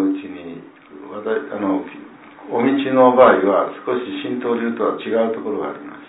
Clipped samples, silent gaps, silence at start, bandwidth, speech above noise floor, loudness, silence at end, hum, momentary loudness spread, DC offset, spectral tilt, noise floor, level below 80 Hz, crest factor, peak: under 0.1%; none; 0 s; 4 kHz; 22 dB; -18 LUFS; 0 s; none; 22 LU; under 0.1%; -10 dB/octave; -39 dBFS; -62 dBFS; 18 dB; 0 dBFS